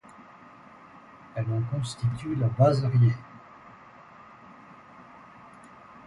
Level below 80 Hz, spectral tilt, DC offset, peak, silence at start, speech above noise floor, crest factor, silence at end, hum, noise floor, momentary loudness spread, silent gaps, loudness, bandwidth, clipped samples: -58 dBFS; -8 dB/octave; under 0.1%; -8 dBFS; 0.95 s; 26 dB; 22 dB; 1.05 s; none; -50 dBFS; 27 LU; none; -26 LUFS; 11 kHz; under 0.1%